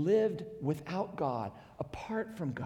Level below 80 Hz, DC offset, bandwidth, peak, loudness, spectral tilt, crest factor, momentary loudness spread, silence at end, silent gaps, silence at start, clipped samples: -64 dBFS; under 0.1%; 14.5 kHz; -18 dBFS; -36 LUFS; -8 dB/octave; 18 dB; 13 LU; 0 s; none; 0 s; under 0.1%